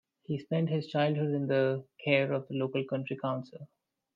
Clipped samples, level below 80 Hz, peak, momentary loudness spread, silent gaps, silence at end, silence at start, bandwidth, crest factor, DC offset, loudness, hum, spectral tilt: under 0.1%; -78 dBFS; -12 dBFS; 10 LU; none; 0.5 s; 0.3 s; 7 kHz; 20 dB; under 0.1%; -31 LUFS; none; -9 dB/octave